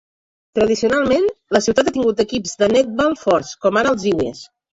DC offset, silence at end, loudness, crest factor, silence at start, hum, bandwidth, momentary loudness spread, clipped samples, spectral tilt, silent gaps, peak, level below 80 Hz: under 0.1%; 0.3 s; -17 LUFS; 16 dB; 0.55 s; none; 8 kHz; 5 LU; under 0.1%; -4.5 dB/octave; none; -2 dBFS; -48 dBFS